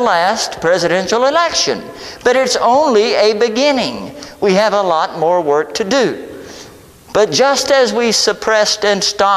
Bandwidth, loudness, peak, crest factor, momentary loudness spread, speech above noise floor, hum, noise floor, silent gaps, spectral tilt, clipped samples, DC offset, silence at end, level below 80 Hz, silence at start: 14.5 kHz; -13 LUFS; 0 dBFS; 12 dB; 8 LU; 25 dB; none; -38 dBFS; none; -2.5 dB/octave; under 0.1%; under 0.1%; 0 s; -50 dBFS; 0 s